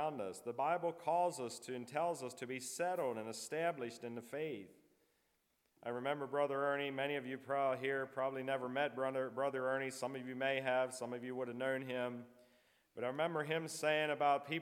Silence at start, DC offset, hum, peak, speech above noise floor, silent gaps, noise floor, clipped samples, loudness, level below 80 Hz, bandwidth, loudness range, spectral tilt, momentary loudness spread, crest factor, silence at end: 0 s; under 0.1%; none; -22 dBFS; 41 dB; none; -81 dBFS; under 0.1%; -40 LUFS; under -90 dBFS; 16.5 kHz; 4 LU; -4 dB/octave; 9 LU; 18 dB; 0 s